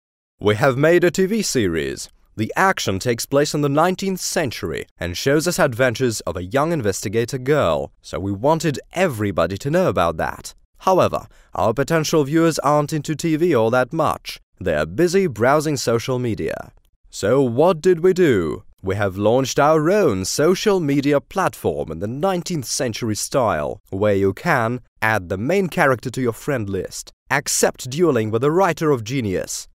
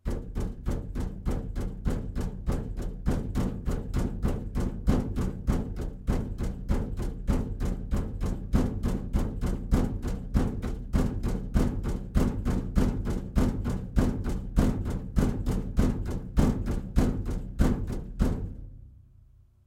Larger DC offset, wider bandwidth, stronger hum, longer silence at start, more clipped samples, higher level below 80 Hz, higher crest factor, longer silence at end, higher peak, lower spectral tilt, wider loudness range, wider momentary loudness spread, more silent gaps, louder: neither; about the same, 16 kHz vs 15 kHz; neither; first, 0.4 s vs 0.05 s; neither; second, -48 dBFS vs -30 dBFS; about the same, 20 dB vs 20 dB; second, 0.15 s vs 0.7 s; first, 0 dBFS vs -8 dBFS; second, -5 dB/octave vs -7.5 dB/octave; about the same, 3 LU vs 3 LU; first, 10 LU vs 7 LU; first, 4.91-4.96 s, 10.65-10.73 s, 14.43-14.53 s, 16.89-17.04 s, 23.80-23.84 s, 24.88-24.96 s, 27.13-27.26 s vs none; first, -19 LUFS vs -31 LUFS